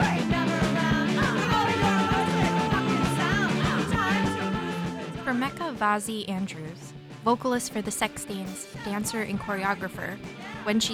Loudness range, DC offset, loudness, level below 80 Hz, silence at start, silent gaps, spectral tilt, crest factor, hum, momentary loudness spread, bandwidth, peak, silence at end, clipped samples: 6 LU; under 0.1%; -27 LUFS; -48 dBFS; 0 s; none; -5 dB/octave; 16 dB; none; 11 LU; 16.5 kHz; -10 dBFS; 0 s; under 0.1%